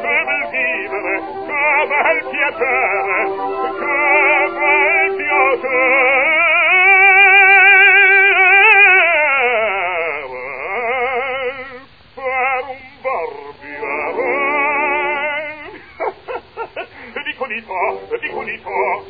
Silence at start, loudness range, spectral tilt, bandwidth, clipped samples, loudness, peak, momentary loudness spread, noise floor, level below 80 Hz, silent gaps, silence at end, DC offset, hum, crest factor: 0 s; 14 LU; -5.5 dB/octave; 5 kHz; under 0.1%; -12 LUFS; 0 dBFS; 20 LU; -38 dBFS; -56 dBFS; none; 0 s; 0.3%; none; 16 dB